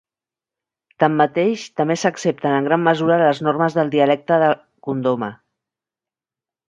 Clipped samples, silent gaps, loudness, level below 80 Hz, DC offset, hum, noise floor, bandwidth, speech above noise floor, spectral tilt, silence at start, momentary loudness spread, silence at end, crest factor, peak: under 0.1%; none; -18 LUFS; -68 dBFS; under 0.1%; none; -90 dBFS; 11 kHz; 72 dB; -6 dB/octave; 1 s; 6 LU; 1.35 s; 18 dB; 0 dBFS